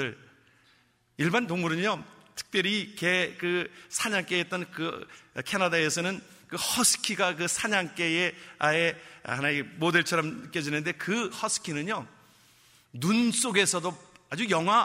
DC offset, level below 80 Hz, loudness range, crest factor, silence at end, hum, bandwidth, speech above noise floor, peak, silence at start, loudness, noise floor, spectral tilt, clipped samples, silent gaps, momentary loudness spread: under 0.1%; -70 dBFS; 3 LU; 24 dB; 0 s; none; 16 kHz; 37 dB; -6 dBFS; 0 s; -27 LUFS; -65 dBFS; -3 dB/octave; under 0.1%; none; 12 LU